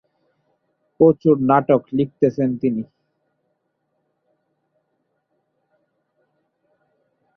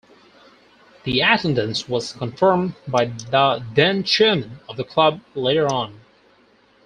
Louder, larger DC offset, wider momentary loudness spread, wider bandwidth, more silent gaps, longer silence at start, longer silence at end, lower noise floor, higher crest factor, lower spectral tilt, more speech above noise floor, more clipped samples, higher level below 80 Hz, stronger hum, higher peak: about the same, -18 LUFS vs -19 LUFS; neither; about the same, 8 LU vs 9 LU; second, 6.2 kHz vs 10 kHz; neither; about the same, 1 s vs 1.05 s; first, 4.55 s vs 0.9 s; first, -72 dBFS vs -56 dBFS; about the same, 20 dB vs 20 dB; first, -10.5 dB/octave vs -5 dB/octave; first, 55 dB vs 36 dB; neither; second, -62 dBFS vs -56 dBFS; neither; about the same, -2 dBFS vs -2 dBFS